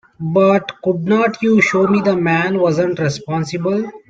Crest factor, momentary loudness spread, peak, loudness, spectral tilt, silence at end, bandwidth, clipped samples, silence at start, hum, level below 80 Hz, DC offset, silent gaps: 14 dB; 7 LU; -2 dBFS; -16 LUFS; -6.5 dB/octave; 0.1 s; 7.8 kHz; under 0.1%; 0.2 s; none; -56 dBFS; under 0.1%; none